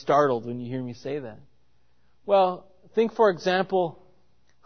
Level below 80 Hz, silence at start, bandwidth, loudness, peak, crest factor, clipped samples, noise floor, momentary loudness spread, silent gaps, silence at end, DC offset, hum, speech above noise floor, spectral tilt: -68 dBFS; 0.05 s; 6.6 kHz; -25 LUFS; -6 dBFS; 20 dB; under 0.1%; -68 dBFS; 13 LU; none; 0.7 s; 0.2%; none; 44 dB; -6.5 dB/octave